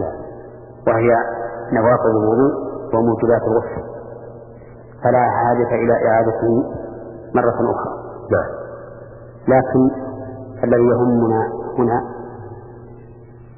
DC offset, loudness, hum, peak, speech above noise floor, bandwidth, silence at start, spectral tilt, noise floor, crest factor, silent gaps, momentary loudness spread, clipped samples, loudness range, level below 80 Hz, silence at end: under 0.1%; -17 LUFS; none; -2 dBFS; 24 dB; 2.9 kHz; 0 s; -15 dB/octave; -40 dBFS; 16 dB; none; 20 LU; under 0.1%; 3 LU; -46 dBFS; 0.05 s